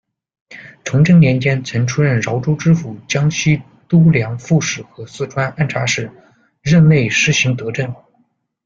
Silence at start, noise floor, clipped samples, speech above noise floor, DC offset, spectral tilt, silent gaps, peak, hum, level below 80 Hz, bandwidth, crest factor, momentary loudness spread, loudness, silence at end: 0.5 s; -61 dBFS; under 0.1%; 47 dB; under 0.1%; -5.5 dB/octave; none; 0 dBFS; none; -48 dBFS; 7.4 kHz; 16 dB; 15 LU; -15 LUFS; 0.7 s